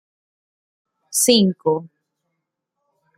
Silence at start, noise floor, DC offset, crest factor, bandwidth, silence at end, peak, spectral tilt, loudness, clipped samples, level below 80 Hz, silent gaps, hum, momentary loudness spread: 1.1 s; -78 dBFS; under 0.1%; 22 dB; 16 kHz; 1.3 s; -2 dBFS; -3.5 dB/octave; -18 LUFS; under 0.1%; -66 dBFS; none; none; 10 LU